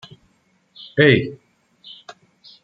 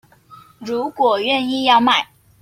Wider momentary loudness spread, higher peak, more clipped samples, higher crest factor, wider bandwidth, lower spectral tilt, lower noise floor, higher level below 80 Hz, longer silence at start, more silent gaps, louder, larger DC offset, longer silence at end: first, 27 LU vs 15 LU; first, 0 dBFS vs -4 dBFS; neither; first, 22 dB vs 16 dB; second, 7.4 kHz vs 16 kHz; first, -7.5 dB/octave vs -3.5 dB/octave; first, -62 dBFS vs -46 dBFS; about the same, -60 dBFS vs -62 dBFS; first, 0.95 s vs 0.3 s; neither; about the same, -16 LUFS vs -17 LUFS; neither; first, 1.3 s vs 0.4 s